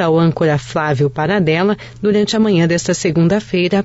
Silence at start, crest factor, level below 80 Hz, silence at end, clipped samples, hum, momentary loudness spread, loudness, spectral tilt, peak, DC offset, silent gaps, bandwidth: 0 s; 10 dB; -46 dBFS; 0 s; under 0.1%; none; 4 LU; -15 LUFS; -6 dB/octave; -4 dBFS; under 0.1%; none; 8 kHz